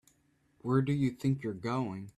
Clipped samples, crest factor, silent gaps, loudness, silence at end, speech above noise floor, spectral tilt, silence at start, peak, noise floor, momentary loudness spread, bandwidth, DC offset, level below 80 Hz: under 0.1%; 18 dB; none; -32 LUFS; 0.1 s; 39 dB; -8 dB/octave; 0.65 s; -14 dBFS; -71 dBFS; 6 LU; 12 kHz; under 0.1%; -66 dBFS